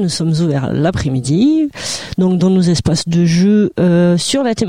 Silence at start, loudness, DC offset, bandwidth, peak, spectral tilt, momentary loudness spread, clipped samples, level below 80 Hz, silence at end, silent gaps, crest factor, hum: 0 s; -14 LUFS; 0.4%; 11.5 kHz; -4 dBFS; -6 dB/octave; 5 LU; under 0.1%; -40 dBFS; 0 s; none; 10 dB; none